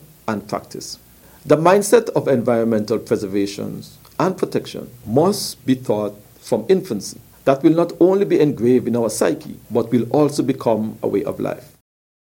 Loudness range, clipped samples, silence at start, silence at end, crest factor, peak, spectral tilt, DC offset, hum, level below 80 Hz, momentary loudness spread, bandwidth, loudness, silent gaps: 4 LU; under 0.1%; 0.25 s; 0.65 s; 18 dB; 0 dBFS; -6 dB/octave; under 0.1%; none; -56 dBFS; 15 LU; 17 kHz; -19 LUFS; none